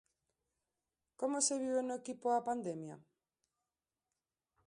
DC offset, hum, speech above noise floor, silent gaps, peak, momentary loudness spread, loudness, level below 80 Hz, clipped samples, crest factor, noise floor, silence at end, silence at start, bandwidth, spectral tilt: under 0.1%; none; over 53 dB; none; -20 dBFS; 11 LU; -37 LUFS; -86 dBFS; under 0.1%; 22 dB; under -90 dBFS; 1.7 s; 1.2 s; 11 kHz; -3 dB/octave